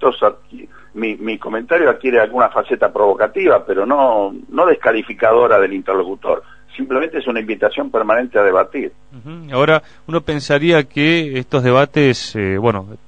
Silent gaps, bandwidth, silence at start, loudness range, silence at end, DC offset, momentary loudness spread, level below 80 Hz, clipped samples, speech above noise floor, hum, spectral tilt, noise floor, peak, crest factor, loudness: none; 9.4 kHz; 0 s; 3 LU; 0.1 s; 0.8%; 9 LU; -50 dBFS; under 0.1%; 23 dB; none; -6.5 dB/octave; -38 dBFS; 0 dBFS; 16 dB; -15 LUFS